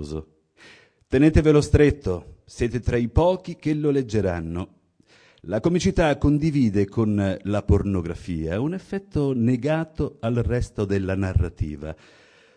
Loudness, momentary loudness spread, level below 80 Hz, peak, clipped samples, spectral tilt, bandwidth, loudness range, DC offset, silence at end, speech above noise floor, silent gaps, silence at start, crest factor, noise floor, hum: -23 LUFS; 13 LU; -36 dBFS; -4 dBFS; under 0.1%; -7.5 dB/octave; 10.5 kHz; 4 LU; under 0.1%; 0.65 s; 35 dB; none; 0 s; 18 dB; -57 dBFS; none